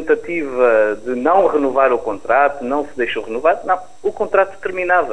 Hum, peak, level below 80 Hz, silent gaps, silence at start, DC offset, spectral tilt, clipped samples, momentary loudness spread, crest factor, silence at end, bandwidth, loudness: none; 0 dBFS; -50 dBFS; none; 0 s; 2%; -5.5 dB/octave; under 0.1%; 8 LU; 16 dB; 0 s; 10.5 kHz; -17 LUFS